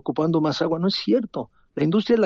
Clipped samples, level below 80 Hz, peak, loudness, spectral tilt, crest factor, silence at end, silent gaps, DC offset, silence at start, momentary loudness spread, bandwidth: under 0.1%; -62 dBFS; -8 dBFS; -22 LUFS; -7 dB/octave; 12 dB; 0 s; none; under 0.1%; 0.05 s; 11 LU; 7.4 kHz